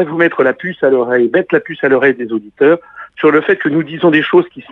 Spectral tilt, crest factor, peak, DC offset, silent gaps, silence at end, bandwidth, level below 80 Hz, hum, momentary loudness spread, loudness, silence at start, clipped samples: -8.5 dB/octave; 12 dB; 0 dBFS; under 0.1%; none; 0.1 s; 4.1 kHz; -60 dBFS; none; 5 LU; -13 LUFS; 0 s; under 0.1%